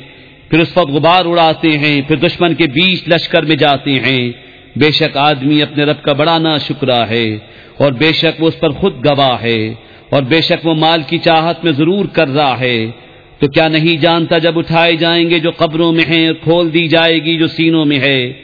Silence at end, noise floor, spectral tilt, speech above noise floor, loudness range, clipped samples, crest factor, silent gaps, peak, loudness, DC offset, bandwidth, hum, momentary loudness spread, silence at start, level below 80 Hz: 0.05 s; -37 dBFS; -7.5 dB/octave; 26 dB; 2 LU; 0.1%; 12 dB; none; 0 dBFS; -11 LUFS; 0.2%; 5.4 kHz; none; 5 LU; 0 s; -46 dBFS